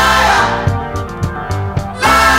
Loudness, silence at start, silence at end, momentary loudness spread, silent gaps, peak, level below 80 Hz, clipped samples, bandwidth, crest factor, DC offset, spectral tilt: -14 LUFS; 0 s; 0 s; 11 LU; none; 0 dBFS; -28 dBFS; under 0.1%; 16.5 kHz; 12 dB; under 0.1%; -4 dB/octave